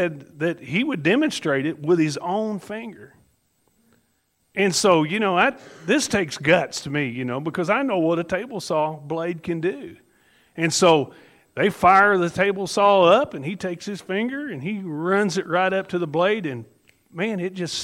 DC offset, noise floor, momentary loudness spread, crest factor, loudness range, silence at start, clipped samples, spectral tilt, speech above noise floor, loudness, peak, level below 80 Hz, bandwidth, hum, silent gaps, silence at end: under 0.1%; -68 dBFS; 13 LU; 20 dB; 6 LU; 0 s; under 0.1%; -4.5 dB/octave; 46 dB; -21 LUFS; -2 dBFS; -62 dBFS; 16 kHz; none; none; 0 s